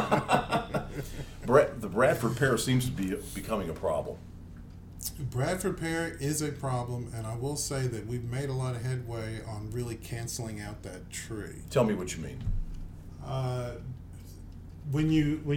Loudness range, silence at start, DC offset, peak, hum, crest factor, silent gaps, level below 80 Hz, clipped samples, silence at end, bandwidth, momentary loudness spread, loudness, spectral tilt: 7 LU; 0 s; under 0.1%; -8 dBFS; none; 24 dB; none; -46 dBFS; under 0.1%; 0 s; 19 kHz; 18 LU; -31 LUFS; -5.5 dB/octave